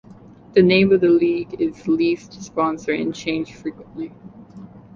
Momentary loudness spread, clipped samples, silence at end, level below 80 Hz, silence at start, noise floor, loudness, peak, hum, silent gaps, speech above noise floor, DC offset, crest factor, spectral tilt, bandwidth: 18 LU; under 0.1%; 0.2 s; -54 dBFS; 0.1 s; -44 dBFS; -19 LUFS; -2 dBFS; none; none; 25 dB; under 0.1%; 18 dB; -6.5 dB/octave; 7.4 kHz